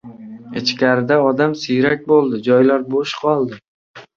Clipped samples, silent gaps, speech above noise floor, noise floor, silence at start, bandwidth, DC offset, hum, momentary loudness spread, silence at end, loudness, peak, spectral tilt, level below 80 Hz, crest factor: under 0.1%; 3.68-3.94 s; 20 dB; -35 dBFS; 0.05 s; 7.4 kHz; under 0.1%; none; 10 LU; 0.15 s; -16 LUFS; -2 dBFS; -6 dB/octave; -60 dBFS; 16 dB